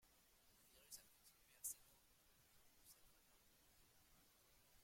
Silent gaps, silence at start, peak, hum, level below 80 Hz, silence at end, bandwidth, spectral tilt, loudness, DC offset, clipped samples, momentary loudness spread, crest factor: none; 0 s; -38 dBFS; none; -84 dBFS; 0 s; 16.5 kHz; 0 dB/octave; -56 LUFS; under 0.1%; under 0.1%; 16 LU; 28 dB